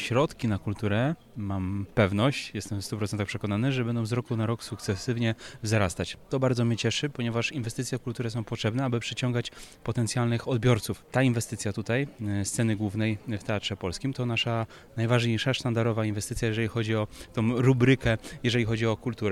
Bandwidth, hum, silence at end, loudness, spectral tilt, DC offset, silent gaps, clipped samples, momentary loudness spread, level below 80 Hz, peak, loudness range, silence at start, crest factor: 13.5 kHz; none; 0 s; -28 LUFS; -5.5 dB/octave; under 0.1%; none; under 0.1%; 8 LU; -52 dBFS; -10 dBFS; 3 LU; 0 s; 18 dB